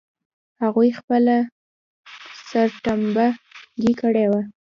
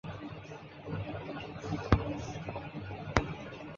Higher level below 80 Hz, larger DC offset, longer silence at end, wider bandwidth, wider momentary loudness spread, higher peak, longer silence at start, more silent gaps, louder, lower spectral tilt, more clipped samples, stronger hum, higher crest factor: second, -58 dBFS vs -46 dBFS; neither; first, 0.25 s vs 0 s; about the same, 7.2 kHz vs 7.4 kHz; about the same, 16 LU vs 14 LU; about the same, -6 dBFS vs -4 dBFS; first, 0.6 s vs 0.05 s; first, 1.04-1.08 s, 1.52-2.04 s vs none; first, -20 LUFS vs -37 LUFS; first, -7 dB/octave vs -5.5 dB/octave; neither; neither; second, 16 dB vs 34 dB